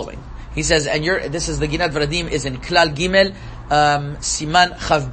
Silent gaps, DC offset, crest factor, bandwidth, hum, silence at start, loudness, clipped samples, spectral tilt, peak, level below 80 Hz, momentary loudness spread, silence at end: none; under 0.1%; 18 dB; 8.8 kHz; none; 0 s; -18 LUFS; under 0.1%; -3.5 dB/octave; 0 dBFS; -34 dBFS; 8 LU; 0 s